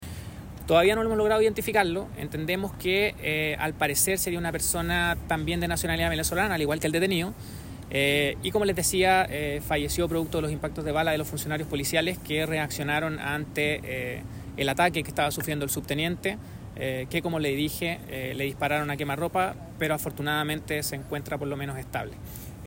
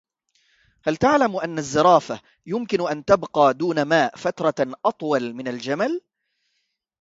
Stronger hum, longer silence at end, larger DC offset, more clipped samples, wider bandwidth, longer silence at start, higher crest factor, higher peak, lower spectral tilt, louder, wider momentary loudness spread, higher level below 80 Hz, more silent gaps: neither; second, 0 s vs 1 s; neither; neither; first, 16.5 kHz vs 8 kHz; second, 0 s vs 0.85 s; about the same, 20 dB vs 20 dB; second, -8 dBFS vs -2 dBFS; about the same, -4 dB/octave vs -5 dB/octave; second, -27 LUFS vs -21 LUFS; about the same, 11 LU vs 12 LU; first, -46 dBFS vs -58 dBFS; neither